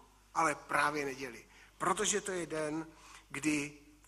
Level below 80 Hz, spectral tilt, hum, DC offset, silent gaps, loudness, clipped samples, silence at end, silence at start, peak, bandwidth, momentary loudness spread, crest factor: -66 dBFS; -3 dB/octave; none; under 0.1%; none; -35 LUFS; under 0.1%; 0.2 s; 0.35 s; -14 dBFS; 14.5 kHz; 14 LU; 22 dB